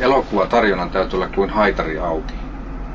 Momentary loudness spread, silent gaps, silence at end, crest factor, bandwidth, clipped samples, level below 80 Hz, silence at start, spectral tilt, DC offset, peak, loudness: 15 LU; none; 0 s; 16 dB; 7.6 kHz; under 0.1%; -30 dBFS; 0 s; -6.5 dB/octave; under 0.1%; -2 dBFS; -19 LUFS